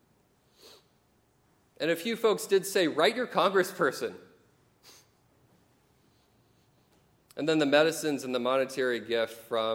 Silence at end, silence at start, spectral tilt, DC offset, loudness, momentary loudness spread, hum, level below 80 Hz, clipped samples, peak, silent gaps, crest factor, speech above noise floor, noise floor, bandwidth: 0 s; 0.65 s; -4 dB/octave; under 0.1%; -28 LUFS; 8 LU; none; -78 dBFS; under 0.1%; -10 dBFS; none; 22 dB; 40 dB; -68 dBFS; 17 kHz